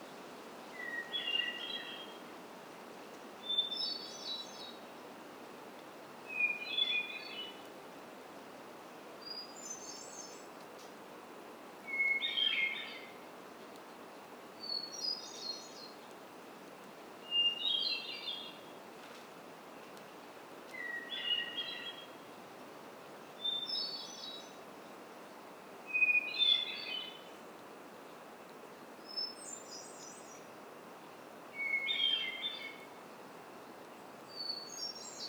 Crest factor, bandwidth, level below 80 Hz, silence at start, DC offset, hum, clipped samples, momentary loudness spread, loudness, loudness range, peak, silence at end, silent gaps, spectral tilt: 22 dB; over 20 kHz; -90 dBFS; 0 s; under 0.1%; none; under 0.1%; 21 LU; -36 LUFS; 12 LU; -20 dBFS; 0 s; none; -0.5 dB/octave